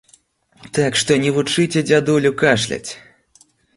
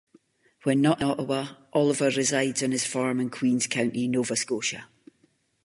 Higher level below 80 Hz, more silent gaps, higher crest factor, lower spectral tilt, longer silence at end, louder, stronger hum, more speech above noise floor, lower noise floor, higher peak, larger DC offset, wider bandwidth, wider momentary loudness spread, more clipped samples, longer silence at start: first, -54 dBFS vs -66 dBFS; neither; about the same, 18 dB vs 18 dB; about the same, -4.5 dB/octave vs -4 dB/octave; about the same, 0.8 s vs 0.8 s; first, -17 LUFS vs -26 LUFS; neither; second, 38 dB vs 42 dB; second, -55 dBFS vs -67 dBFS; first, -2 dBFS vs -8 dBFS; neither; about the same, 11.5 kHz vs 11.5 kHz; first, 11 LU vs 7 LU; neither; about the same, 0.65 s vs 0.65 s